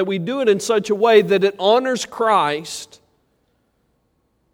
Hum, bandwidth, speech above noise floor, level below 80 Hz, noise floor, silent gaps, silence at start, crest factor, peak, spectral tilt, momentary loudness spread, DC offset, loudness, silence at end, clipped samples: none; 16 kHz; 48 dB; -66 dBFS; -66 dBFS; none; 0 s; 18 dB; -2 dBFS; -4 dB/octave; 10 LU; under 0.1%; -17 LUFS; 1.7 s; under 0.1%